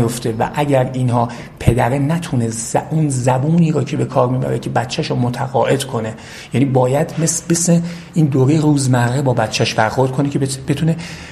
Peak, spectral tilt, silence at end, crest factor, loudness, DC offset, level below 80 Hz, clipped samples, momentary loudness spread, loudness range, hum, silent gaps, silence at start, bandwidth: 0 dBFS; -5.5 dB/octave; 0 s; 16 dB; -16 LUFS; under 0.1%; -40 dBFS; under 0.1%; 5 LU; 2 LU; none; none; 0 s; 13.5 kHz